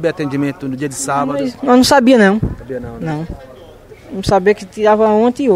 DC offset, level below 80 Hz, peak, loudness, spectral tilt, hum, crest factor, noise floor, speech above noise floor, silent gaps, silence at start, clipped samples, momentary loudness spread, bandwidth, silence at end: under 0.1%; -36 dBFS; 0 dBFS; -14 LUFS; -5 dB/octave; none; 14 dB; -38 dBFS; 24 dB; none; 0 s; under 0.1%; 16 LU; 16 kHz; 0 s